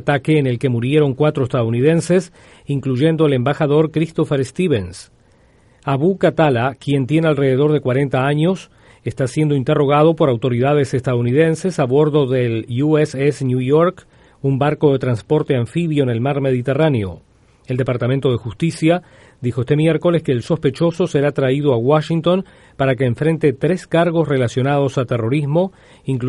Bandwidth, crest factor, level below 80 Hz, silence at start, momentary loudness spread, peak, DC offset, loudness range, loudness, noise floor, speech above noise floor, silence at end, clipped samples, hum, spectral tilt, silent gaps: 11.5 kHz; 14 dB; -50 dBFS; 0 s; 6 LU; -2 dBFS; under 0.1%; 2 LU; -17 LUFS; -52 dBFS; 35 dB; 0 s; under 0.1%; none; -7.5 dB/octave; none